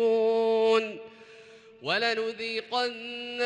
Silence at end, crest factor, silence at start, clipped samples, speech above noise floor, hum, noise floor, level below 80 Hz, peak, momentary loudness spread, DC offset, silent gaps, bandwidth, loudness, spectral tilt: 0 s; 14 dB; 0 s; under 0.1%; 21 dB; none; -51 dBFS; -78 dBFS; -14 dBFS; 14 LU; under 0.1%; none; 9.6 kHz; -27 LUFS; -3.5 dB/octave